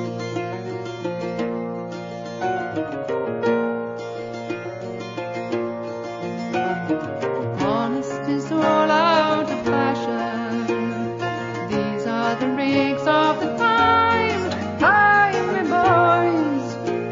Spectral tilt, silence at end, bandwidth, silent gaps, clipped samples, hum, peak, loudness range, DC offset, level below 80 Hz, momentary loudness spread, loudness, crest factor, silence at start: -6 dB/octave; 0 s; 7.6 kHz; none; under 0.1%; none; -4 dBFS; 9 LU; under 0.1%; -56 dBFS; 14 LU; -21 LUFS; 16 dB; 0 s